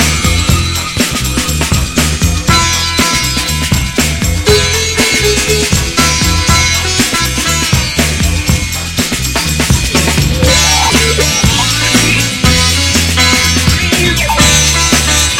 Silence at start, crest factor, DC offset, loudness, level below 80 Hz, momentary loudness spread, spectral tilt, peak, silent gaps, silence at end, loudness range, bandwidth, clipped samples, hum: 0 s; 10 dB; under 0.1%; -9 LUFS; -20 dBFS; 5 LU; -3 dB/octave; 0 dBFS; none; 0 s; 3 LU; 17 kHz; 0.2%; none